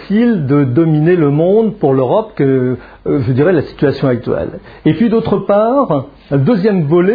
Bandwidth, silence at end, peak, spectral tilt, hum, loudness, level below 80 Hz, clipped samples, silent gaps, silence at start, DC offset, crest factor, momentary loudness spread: 5 kHz; 0 s; 0 dBFS; -11.5 dB/octave; none; -13 LUFS; -42 dBFS; under 0.1%; none; 0 s; under 0.1%; 12 dB; 7 LU